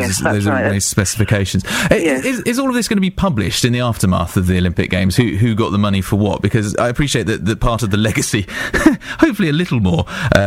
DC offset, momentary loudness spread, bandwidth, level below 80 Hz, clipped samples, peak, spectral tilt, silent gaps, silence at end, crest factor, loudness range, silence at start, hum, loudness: under 0.1%; 3 LU; 16.5 kHz; -32 dBFS; under 0.1%; 0 dBFS; -5 dB/octave; none; 0 s; 16 dB; 1 LU; 0 s; none; -16 LUFS